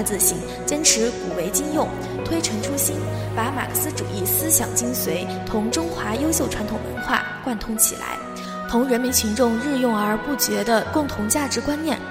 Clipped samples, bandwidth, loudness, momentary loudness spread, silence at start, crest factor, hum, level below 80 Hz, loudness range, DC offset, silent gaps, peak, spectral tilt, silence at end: under 0.1%; 16 kHz; -21 LUFS; 9 LU; 0 s; 20 dB; none; -42 dBFS; 2 LU; under 0.1%; none; -2 dBFS; -3 dB/octave; 0 s